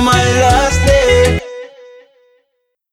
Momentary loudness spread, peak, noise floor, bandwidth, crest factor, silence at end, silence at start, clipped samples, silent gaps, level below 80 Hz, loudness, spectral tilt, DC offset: 16 LU; 0 dBFS; -68 dBFS; 16 kHz; 14 dB; 1.25 s; 0 s; under 0.1%; none; -22 dBFS; -11 LUFS; -4.5 dB/octave; under 0.1%